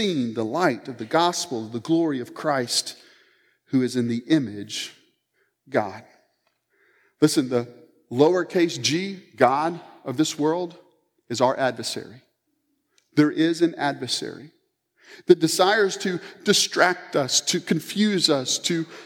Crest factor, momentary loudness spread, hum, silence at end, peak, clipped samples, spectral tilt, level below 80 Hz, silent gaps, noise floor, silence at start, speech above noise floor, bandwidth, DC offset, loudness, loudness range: 24 dB; 12 LU; none; 0 s; 0 dBFS; under 0.1%; -3.5 dB/octave; -78 dBFS; none; -73 dBFS; 0 s; 50 dB; 17.5 kHz; under 0.1%; -23 LUFS; 6 LU